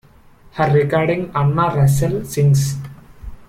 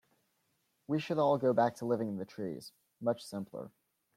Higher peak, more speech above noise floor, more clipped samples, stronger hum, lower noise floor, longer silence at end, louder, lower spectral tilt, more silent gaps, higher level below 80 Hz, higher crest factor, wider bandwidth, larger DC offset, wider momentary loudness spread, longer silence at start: first, -4 dBFS vs -16 dBFS; second, 31 dB vs 45 dB; neither; neither; second, -46 dBFS vs -78 dBFS; second, 0.05 s vs 0.5 s; first, -17 LUFS vs -34 LUFS; about the same, -7 dB/octave vs -7 dB/octave; neither; first, -40 dBFS vs -78 dBFS; about the same, 14 dB vs 18 dB; about the same, 15 kHz vs 15.5 kHz; neither; second, 11 LU vs 18 LU; second, 0.55 s vs 0.9 s